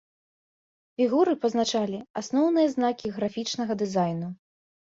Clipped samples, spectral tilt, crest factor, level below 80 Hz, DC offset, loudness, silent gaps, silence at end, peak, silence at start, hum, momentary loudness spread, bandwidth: under 0.1%; -5.5 dB/octave; 16 dB; -68 dBFS; under 0.1%; -26 LUFS; 2.10-2.14 s; 0.55 s; -10 dBFS; 1 s; none; 12 LU; 7.8 kHz